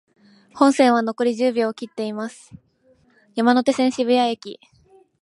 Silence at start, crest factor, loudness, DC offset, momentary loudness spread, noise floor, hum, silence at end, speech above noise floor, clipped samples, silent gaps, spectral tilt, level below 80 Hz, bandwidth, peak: 0.55 s; 20 dB; -20 LUFS; under 0.1%; 15 LU; -59 dBFS; none; 0.7 s; 39 dB; under 0.1%; none; -4.5 dB/octave; -68 dBFS; 11.5 kHz; -2 dBFS